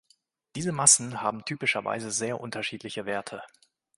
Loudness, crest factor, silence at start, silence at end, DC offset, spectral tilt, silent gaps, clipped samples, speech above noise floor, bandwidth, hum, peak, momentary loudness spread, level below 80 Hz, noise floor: -26 LUFS; 26 dB; 0.55 s; 0.5 s; under 0.1%; -2 dB/octave; none; under 0.1%; 40 dB; 11.5 kHz; none; -4 dBFS; 16 LU; -68 dBFS; -68 dBFS